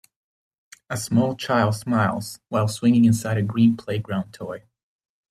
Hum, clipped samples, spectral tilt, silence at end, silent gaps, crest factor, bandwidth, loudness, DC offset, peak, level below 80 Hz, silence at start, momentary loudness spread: none; under 0.1%; -6.5 dB/octave; 0.7 s; none; 16 dB; 14 kHz; -22 LUFS; under 0.1%; -6 dBFS; -60 dBFS; 0.9 s; 14 LU